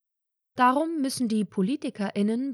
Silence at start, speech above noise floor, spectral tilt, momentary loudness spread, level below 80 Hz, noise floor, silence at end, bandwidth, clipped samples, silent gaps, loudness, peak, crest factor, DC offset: 0.55 s; 58 dB; -5.5 dB/octave; 8 LU; -78 dBFS; -84 dBFS; 0 s; 14 kHz; under 0.1%; none; -26 LUFS; -10 dBFS; 16 dB; under 0.1%